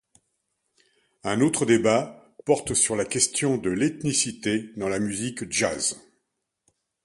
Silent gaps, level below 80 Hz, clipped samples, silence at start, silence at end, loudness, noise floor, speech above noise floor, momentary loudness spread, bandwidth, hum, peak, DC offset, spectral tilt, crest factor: none; -58 dBFS; under 0.1%; 1.25 s; 1.05 s; -24 LUFS; -78 dBFS; 54 dB; 8 LU; 11.5 kHz; none; -6 dBFS; under 0.1%; -3.5 dB/octave; 20 dB